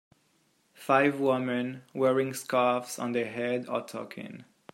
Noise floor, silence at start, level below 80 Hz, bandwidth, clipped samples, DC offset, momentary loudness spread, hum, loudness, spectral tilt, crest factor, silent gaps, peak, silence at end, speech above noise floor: -69 dBFS; 0.8 s; -78 dBFS; 16 kHz; under 0.1%; under 0.1%; 17 LU; none; -28 LUFS; -5 dB/octave; 22 dB; none; -8 dBFS; 0.3 s; 41 dB